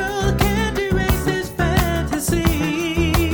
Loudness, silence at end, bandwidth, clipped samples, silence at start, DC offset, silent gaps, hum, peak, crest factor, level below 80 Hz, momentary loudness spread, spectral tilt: -19 LUFS; 0 s; over 20 kHz; under 0.1%; 0 s; 0.1%; none; none; -2 dBFS; 16 dB; -26 dBFS; 3 LU; -5 dB/octave